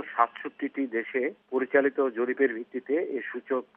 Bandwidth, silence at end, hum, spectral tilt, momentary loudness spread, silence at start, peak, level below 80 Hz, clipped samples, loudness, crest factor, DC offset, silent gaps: 3.7 kHz; 0.15 s; none; -3 dB/octave; 9 LU; 0 s; -8 dBFS; -88 dBFS; under 0.1%; -28 LUFS; 20 dB; under 0.1%; none